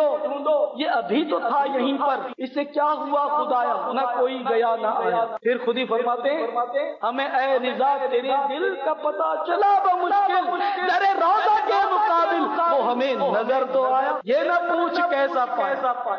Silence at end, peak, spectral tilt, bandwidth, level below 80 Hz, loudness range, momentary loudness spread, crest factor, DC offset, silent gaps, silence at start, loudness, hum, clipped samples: 0 s; -12 dBFS; -5.5 dB/octave; 6.8 kHz; -78 dBFS; 3 LU; 5 LU; 10 dB; under 0.1%; none; 0 s; -22 LUFS; none; under 0.1%